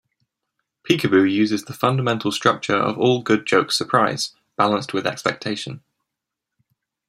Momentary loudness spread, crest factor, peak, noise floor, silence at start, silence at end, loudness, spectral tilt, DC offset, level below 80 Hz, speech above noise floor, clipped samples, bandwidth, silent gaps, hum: 10 LU; 20 dB; -2 dBFS; -83 dBFS; 0.85 s; 1.3 s; -20 LUFS; -5 dB/octave; under 0.1%; -64 dBFS; 63 dB; under 0.1%; 16 kHz; none; none